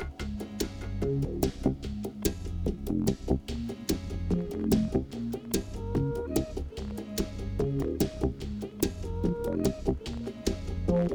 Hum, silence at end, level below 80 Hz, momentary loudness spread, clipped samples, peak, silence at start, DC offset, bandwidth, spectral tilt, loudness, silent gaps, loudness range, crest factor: none; 0 s; -38 dBFS; 7 LU; under 0.1%; -12 dBFS; 0 s; under 0.1%; 19.5 kHz; -6.5 dB/octave; -32 LUFS; none; 1 LU; 20 dB